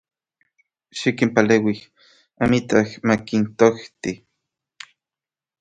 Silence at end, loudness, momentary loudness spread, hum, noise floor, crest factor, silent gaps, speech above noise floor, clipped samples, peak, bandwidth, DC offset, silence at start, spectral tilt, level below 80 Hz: 1.45 s; -20 LUFS; 22 LU; none; under -90 dBFS; 22 dB; none; over 71 dB; under 0.1%; 0 dBFS; 9.2 kHz; under 0.1%; 0.95 s; -6 dB/octave; -54 dBFS